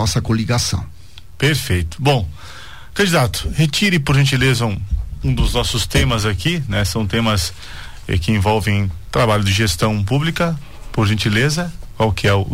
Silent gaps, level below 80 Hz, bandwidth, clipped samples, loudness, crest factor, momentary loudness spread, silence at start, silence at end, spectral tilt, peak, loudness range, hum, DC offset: none; -30 dBFS; 16 kHz; under 0.1%; -17 LUFS; 12 dB; 11 LU; 0 s; 0 s; -5 dB/octave; -6 dBFS; 2 LU; none; 2%